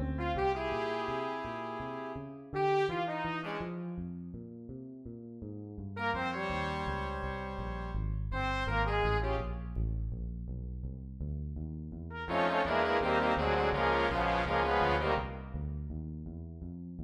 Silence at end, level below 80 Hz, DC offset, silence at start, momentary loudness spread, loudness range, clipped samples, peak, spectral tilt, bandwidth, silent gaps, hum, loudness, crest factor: 0 s; -42 dBFS; under 0.1%; 0 s; 15 LU; 8 LU; under 0.1%; -16 dBFS; -7 dB/octave; 10.5 kHz; none; none; -34 LUFS; 18 dB